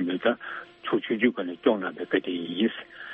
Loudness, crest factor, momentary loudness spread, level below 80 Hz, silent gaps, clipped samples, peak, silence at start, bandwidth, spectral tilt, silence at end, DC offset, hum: -27 LUFS; 20 dB; 9 LU; -72 dBFS; none; under 0.1%; -8 dBFS; 0 s; 4.5 kHz; -3 dB/octave; 0 s; under 0.1%; none